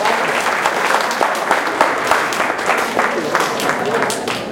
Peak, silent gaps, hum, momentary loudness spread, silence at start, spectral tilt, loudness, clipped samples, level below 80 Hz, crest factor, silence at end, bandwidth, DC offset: 0 dBFS; none; none; 2 LU; 0 s; -2.5 dB/octave; -16 LUFS; under 0.1%; -56 dBFS; 16 dB; 0 s; 17 kHz; under 0.1%